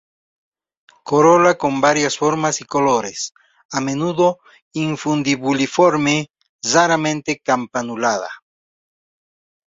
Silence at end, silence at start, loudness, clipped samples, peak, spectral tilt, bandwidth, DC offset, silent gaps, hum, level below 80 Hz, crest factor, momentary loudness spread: 1.35 s; 1.05 s; -17 LUFS; under 0.1%; -2 dBFS; -4 dB/octave; 8 kHz; under 0.1%; 3.65-3.69 s, 4.62-4.71 s, 6.49-6.59 s; none; -60 dBFS; 18 dB; 12 LU